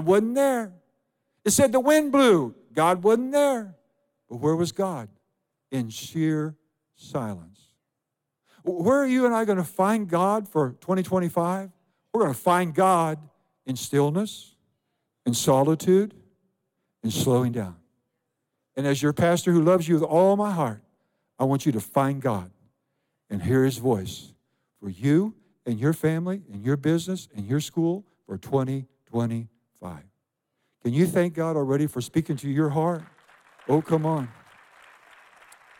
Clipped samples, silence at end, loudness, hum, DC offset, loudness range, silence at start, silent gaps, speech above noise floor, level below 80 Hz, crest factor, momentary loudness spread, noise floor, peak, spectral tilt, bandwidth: under 0.1%; 1.5 s; -24 LUFS; none; under 0.1%; 7 LU; 0 s; none; 60 dB; -68 dBFS; 18 dB; 15 LU; -83 dBFS; -8 dBFS; -6 dB/octave; 17 kHz